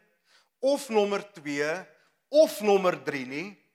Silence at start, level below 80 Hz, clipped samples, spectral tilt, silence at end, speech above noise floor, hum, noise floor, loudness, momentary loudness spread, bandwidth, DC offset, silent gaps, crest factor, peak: 0.6 s; under -90 dBFS; under 0.1%; -4.5 dB/octave; 0.2 s; 40 dB; none; -66 dBFS; -27 LUFS; 12 LU; 16 kHz; under 0.1%; none; 18 dB; -10 dBFS